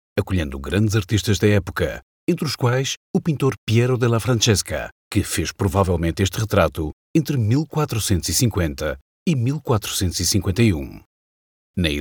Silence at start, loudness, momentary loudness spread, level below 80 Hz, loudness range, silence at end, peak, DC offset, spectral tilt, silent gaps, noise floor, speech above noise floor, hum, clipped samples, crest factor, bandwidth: 0.15 s; -21 LUFS; 7 LU; -38 dBFS; 1 LU; 0 s; 0 dBFS; under 0.1%; -5 dB/octave; 2.03-2.27 s, 2.97-3.14 s, 3.58-3.67 s, 4.92-5.11 s, 6.93-7.14 s, 9.01-9.26 s, 11.06-11.74 s; under -90 dBFS; over 70 dB; none; under 0.1%; 20 dB; 19 kHz